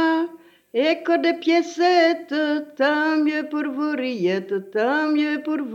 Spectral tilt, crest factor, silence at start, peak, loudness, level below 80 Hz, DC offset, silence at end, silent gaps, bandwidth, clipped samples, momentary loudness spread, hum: -5 dB/octave; 14 dB; 0 s; -6 dBFS; -21 LUFS; -84 dBFS; under 0.1%; 0 s; none; 7.6 kHz; under 0.1%; 7 LU; 50 Hz at -70 dBFS